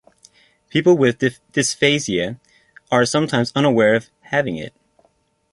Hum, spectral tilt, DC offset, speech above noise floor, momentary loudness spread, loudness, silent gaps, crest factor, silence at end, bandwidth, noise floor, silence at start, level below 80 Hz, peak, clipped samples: none; -4.5 dB/octave; under 0.1%; 45 dB; 11 LU; -18 LUFS; none; 18 dB; 0.85 s; 11.5 kHz; -62 dBFS; 0.75 s; -56 dBFS; -2 dBFS; under 0.1%